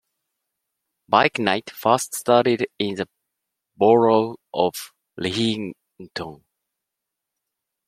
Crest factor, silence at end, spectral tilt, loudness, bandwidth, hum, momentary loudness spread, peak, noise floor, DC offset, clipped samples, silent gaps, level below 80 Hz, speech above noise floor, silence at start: 22 dB; 1.5 s; -4.5 dB/octave; -21 LUFS; 16 kHz; none; 17 LU; 0 dBFS; -83 dBFS; under 0.1%; under 0.1%; none; -66 dBFS; 63 dB; 1.1 s